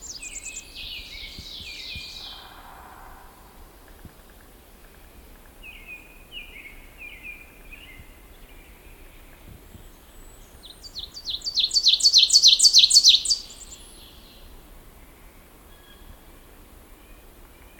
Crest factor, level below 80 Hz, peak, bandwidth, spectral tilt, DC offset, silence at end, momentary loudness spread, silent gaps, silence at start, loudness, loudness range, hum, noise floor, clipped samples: 24 dB; -50 dBFS; -2 dBFS; 17.5 kHz; 2 dB/octave; under 0.1%; 4.15 s; 30 LU; none; 0.05 s; -15 LUFS; 26 LU; none; -49 dBFS; under 0.1%